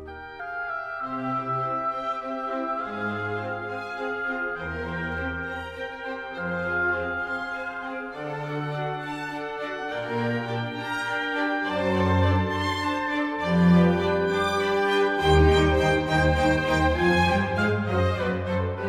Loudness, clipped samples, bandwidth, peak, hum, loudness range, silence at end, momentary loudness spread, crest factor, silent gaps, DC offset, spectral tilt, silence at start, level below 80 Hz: -25 LUFS; under 0.1%; 13.5 kHz; -8 dBFS; none; 9 LU; 0 s; 11 LU; 18 dB; none; under 0.1%; -6.5 dB/octave; 0 s; -38 dBFS